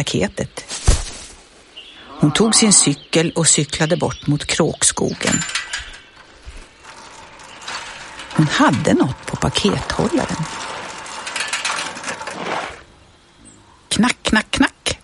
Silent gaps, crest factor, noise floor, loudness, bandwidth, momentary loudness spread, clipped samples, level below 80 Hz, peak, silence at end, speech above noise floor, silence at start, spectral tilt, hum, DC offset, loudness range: none; 20 dB; -48 dBFS; -18 LUFS; 11.5 kHz; 20 LU; under 0.1%; -34 dBFS; 0 dBFS; 0.05 s; 32 dB; 0 s; -3.5 dB/octave; none; under 0.1%; 10 LU